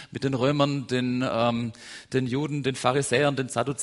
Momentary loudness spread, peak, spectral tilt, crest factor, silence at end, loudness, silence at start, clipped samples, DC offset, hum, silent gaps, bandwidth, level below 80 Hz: 7 LU; -6 dBFS; -5 dB/octave; 20 dB; 0 s; -26 LUFS; 0 s; under 0.1%; under 0.1%; none; none; 11.5 kHz; -60 dBFS